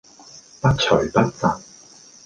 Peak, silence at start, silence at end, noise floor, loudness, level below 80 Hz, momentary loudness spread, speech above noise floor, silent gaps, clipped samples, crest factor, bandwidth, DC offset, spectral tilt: -2 dBFS; 0.65 s; 0.65 s; -47 dBFS; -20 LUFS; -44 dBFS; 6 LU; 28 dB; none; under 0.1%; 20 dB; 9.4 kHz; under 0.1%; -5.5 dB/octave